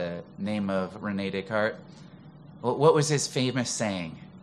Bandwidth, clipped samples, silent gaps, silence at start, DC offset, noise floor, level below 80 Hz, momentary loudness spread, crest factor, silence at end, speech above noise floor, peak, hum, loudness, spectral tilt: 13 kHz; under 0.1%; none; 0 s; under 0.1%; -48 dBFS; -66 dBFS; 13 LU; 22 dB; 0 s; 21 dB; -6 dBFS; none; -27 LUFS; -4.5 dB/octave